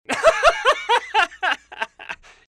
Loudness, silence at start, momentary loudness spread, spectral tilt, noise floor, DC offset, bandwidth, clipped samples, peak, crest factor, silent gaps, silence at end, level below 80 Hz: -19 LUFS; 0.1 s; 15 LU; -1 dB/octave; -38 dBFS; under 0.1%; 14 kHz; under 0.1%; -6 dBFS; 16 dB; none; 0.35 s; -46 dBFS